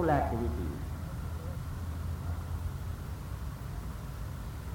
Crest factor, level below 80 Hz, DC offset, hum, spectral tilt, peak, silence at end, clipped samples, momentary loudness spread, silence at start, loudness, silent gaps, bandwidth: 20 dB; -40 dBFS; under 0.1%; none; -7.5 dB/octave; -14 dBFS; 0 s; under 0.1%; 8 LU; 0 s; -37 LUFS; none; 18.5 kHz